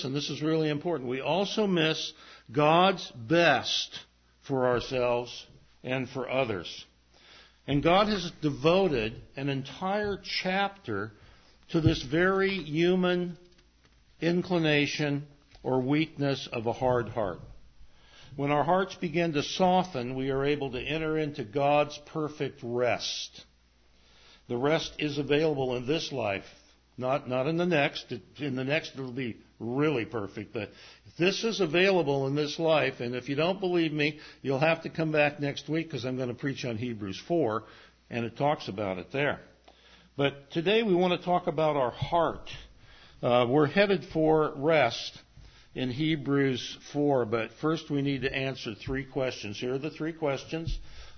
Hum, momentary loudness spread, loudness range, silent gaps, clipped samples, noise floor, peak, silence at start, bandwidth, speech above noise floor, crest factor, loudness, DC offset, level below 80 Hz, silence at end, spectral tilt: none; 11 LU; 5 LU; none; under 0.1%; -63 dBFS; -8 dBFS; 0 s; 6.6 kHz; 34 dB; 20 dB; -29 LUFS; under 0.1%; -54 dBFS; 0 s; -5.5 dB/octave